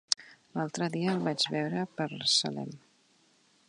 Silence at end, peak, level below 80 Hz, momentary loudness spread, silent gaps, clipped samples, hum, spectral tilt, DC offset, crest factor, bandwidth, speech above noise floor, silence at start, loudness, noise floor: 0.9 s; -4 dBFS; -76 dBFS; 12 LU; none; under 0.1%; none; -3.5 dB/octave; under 0.1%; 28 dB; 11 kHz; 35 dB; 0.1 s; -31 LUFS; -67 dBFS